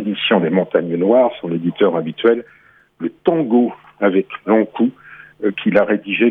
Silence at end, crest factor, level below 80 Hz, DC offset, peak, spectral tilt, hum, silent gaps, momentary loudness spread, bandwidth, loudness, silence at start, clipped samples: 0 s; 16 dB; -64 dBFS; under 0.1%; -2 dBFS; -9 dB/octave; none; none; 7 LU; 4.2 kHz; -17 LUFS; 0 s; under 0.1%